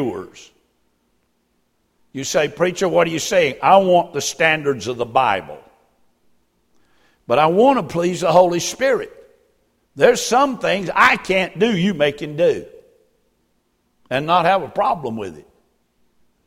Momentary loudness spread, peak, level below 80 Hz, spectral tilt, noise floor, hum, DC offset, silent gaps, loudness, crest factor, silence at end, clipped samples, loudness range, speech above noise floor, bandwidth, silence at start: 12 LU; 0 dBFS; -54 dBFS; -4 dB/octave; -66 dBFS; none; under 0.1%; none; -17 LUFS; 20 dB; 1.05 s; under 0.1%; 5 LU; 48 dB; 16 kHz; 0 s